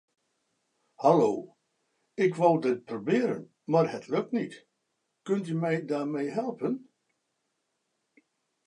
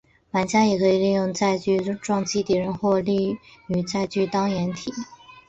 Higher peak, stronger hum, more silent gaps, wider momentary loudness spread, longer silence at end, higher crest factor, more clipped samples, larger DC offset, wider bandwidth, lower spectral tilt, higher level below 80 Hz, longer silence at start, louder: about the same, -8 dBFS vs -8 dBFS; neither; neither; first, 13 LU vs 9 LU; first, 1.9 s vs 0.1 s; first, 22 dB vs 16 dB; neither; neither; first, 11 kHz vs 8.2 kHz; first, -7.5 dB/octave vs -5.5 dB/octave; second, -82 dBFS vs -56 dBFS; first, 1 s vs 0.35 s; second, -28 LUFS vs -23 LUFS